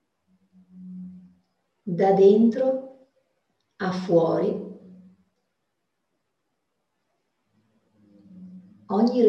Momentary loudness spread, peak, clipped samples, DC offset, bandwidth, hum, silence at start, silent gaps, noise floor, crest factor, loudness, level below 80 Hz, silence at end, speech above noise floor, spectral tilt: 27 LU; -6 dBFS; under 0.1%; under 0.1%; 7 kHz; none; 0.75 s; none; -79 dBFS; 20 dB; -22 LUFS; -74 dBFS; 0 s; 59 dB; -8.5 dB/octave